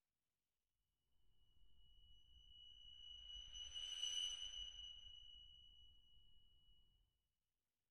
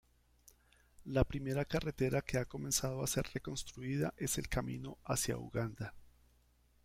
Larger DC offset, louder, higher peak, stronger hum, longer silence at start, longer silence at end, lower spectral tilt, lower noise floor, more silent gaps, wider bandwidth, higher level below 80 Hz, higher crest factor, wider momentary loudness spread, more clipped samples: neither; second, -50 LUFS vs -38 LUFS; second, -34 dBFS vs -14 dBFS; second, none vs 60 Hz at -60 dBFS; second, 0 s vs 1 s; second, 0 s vs 0.8 s; second, 2 dB/octave vs -4.5 dB/octave; first, under -90 dBFS vs -70 dBFS; neither; second, 12.5 kHz vs 16.5 kHz; second, -72 dBFS vs -52 dBFS; about the same, 22 dB vs 26 dB; first, 22 LU vs 9 LU; neither